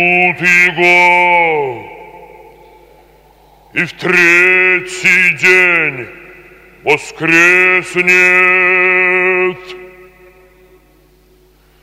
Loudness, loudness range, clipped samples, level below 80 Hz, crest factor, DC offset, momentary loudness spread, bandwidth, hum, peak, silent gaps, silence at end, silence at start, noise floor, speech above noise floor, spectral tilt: -9 LUFS; 5 LU; 0.2%; -52 dBFS; 12 dB; under 0.1%; 12 LU; 16 kHz; none; 0 dBFS; none; 1.95 s; 0 s; -48 dBFS; 38 dB; -4 dB/octave